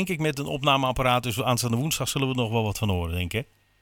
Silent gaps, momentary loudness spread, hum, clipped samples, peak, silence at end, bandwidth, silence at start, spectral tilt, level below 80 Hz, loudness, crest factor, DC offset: none; 6 LU; none; under 0.1%; -6 dBFS; 0.4 s; 18 kHz; 0 s; -4.5 dB/octave; -46 dBFS; -25 LUFS; 18 dB; under 0.1%